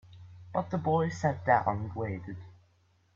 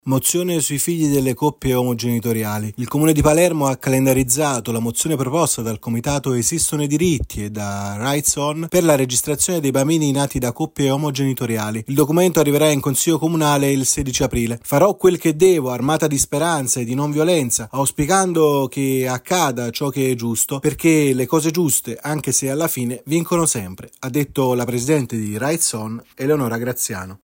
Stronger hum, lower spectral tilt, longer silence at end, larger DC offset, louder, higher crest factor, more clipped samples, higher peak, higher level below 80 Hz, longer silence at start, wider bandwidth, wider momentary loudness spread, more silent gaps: neither; first, -7.5 dB/octave vs -4.5 dB/octave; first, 0.6 s vs 0.1 s; neither; second, -31 LUFS vs -18 LUFS; first, 22 dB vs 16 dB; neither; second, -10 dBFS vs -2 dBFS; second, -64 dBFS vs -42 dBFS; about the same, 0.1 s vs 0.05 s; second, 7.4 kHz vs 16.5 kHz; first, 17 LU vs 8 LU; neither